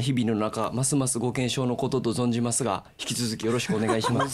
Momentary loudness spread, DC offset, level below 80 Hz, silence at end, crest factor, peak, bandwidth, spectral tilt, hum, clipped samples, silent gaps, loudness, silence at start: 4 LU; under 0.1%; -58 dBFS; 0 s; 14 dB; -12 dBFS; 15 kHz; -4.5 dB/octave; none; under 0.1%; none; -26 LUFS; 0 s